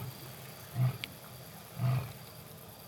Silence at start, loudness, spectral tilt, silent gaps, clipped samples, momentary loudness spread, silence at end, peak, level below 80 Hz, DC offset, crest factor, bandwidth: 0 s; -38 LUFS; -5.5 dB/octave; none; under 0.1%; 14 LU; 0 s; -16 dBFS; -66 dBFS; under 0.1%; 22 dB; 19.5 kHz